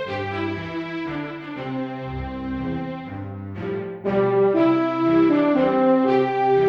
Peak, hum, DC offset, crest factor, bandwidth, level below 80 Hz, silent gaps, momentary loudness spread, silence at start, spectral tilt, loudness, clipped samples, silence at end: -8 dBFS; none; under 0.1%; 14 dB; 6.2 kHz; -46 dBFS; none; 13 LU; 0 s; -8.5 dB/octave; -22 LUFS; under 0.1%; 0 s